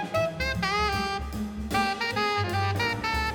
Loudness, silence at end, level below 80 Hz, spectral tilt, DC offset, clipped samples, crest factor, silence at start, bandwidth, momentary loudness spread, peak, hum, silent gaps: -27 LUFS; 0 s; -40 dBFS; -4.5 dB/octave; under 0.1%; under 0.1%; 14 dB; 0 s; 20 kHz; 5 LU; -12 dBFS; none; none